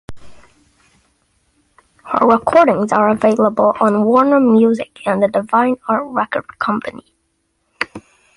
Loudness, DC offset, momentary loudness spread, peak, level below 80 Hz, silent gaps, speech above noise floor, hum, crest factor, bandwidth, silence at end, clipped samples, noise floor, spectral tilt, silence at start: -15 LUFS; under 0.1%; 11 LU; 0 dBFS; -52 dBFS; none; 52 dB; none; 16 dB; 11 kHz; 0.35 s; under 0.1%; -66 dBFS; -7 dB/octave; 0.1 s